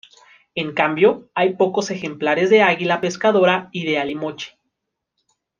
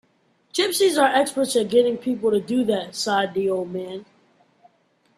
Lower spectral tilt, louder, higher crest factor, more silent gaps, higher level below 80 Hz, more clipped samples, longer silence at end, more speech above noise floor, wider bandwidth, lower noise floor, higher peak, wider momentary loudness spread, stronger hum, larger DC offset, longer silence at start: first, -5 dB/octave vs -3.5 dB/octave; first, -18 LUFS vs -21 LUFS; about the same, 18 dB vs 18 dB; neither; about the same, -66 dBFS vs -66 dBFS; neither; about the same, 1.15 s vs 1.15 s; first, 61 dB vs 43 dB; second, 7.4 kHz vs 15 kHz; first, -79 dBFS vs -64 dBFS; about the same, -2 dBFS vs -4 dBFS; about the same, 13 LU vs 11 LU; neither; neither; about the same, 0.55 s vs 0.55 s